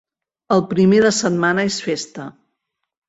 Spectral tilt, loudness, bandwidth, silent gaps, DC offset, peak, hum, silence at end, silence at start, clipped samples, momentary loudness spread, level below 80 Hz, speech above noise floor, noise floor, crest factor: -5 dB/octave; -17 LUFS; 8 kHz; none; under 0.1%; -2 dBFS; none; 0.8 s; 0.5 s; under 0.1%; 18 LU; -58 dBFS; 60 dB; -76 dBFS; 16 dB